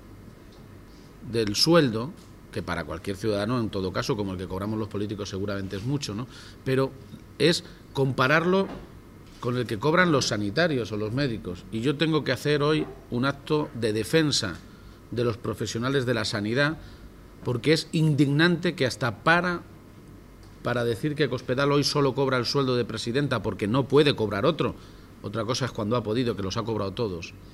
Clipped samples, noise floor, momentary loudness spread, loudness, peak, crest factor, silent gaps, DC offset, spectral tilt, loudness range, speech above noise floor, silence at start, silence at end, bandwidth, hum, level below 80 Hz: under 0.1%; -47 dBFS; 12 LU; -26 LUFS; -6 dBFS; 20 dB; none; under 0.1%; -5.5 dB/octave; 5 LU; 22 dB; 0 s; 0 s; 16 kHz; none; -52 dBFS